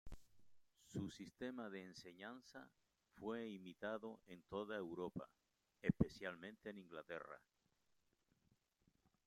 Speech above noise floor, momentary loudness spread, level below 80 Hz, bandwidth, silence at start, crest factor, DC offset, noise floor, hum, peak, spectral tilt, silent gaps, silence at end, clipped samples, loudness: 36 dB; 17 LU; -68 dBFS; 15.5 kHz; 0.05 s; 30 dB; under 0.1%; -85 dBFS; none; -20 dBFS; -6.5 dB/octave; none; 1.9 s; under 0.1%; -50 LUFS